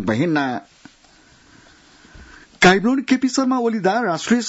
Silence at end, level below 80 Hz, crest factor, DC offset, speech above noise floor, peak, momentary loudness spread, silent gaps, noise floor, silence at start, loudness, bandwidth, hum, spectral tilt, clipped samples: 0 s; -52 dBFS; 16 dB; under 0.1%; 34 dB; -4 dBFS; 8 LU; none; -51 dBFS; 0 s; -18 LUFS; 8 kHz; none; -4.5 dB/octave; under 0.1%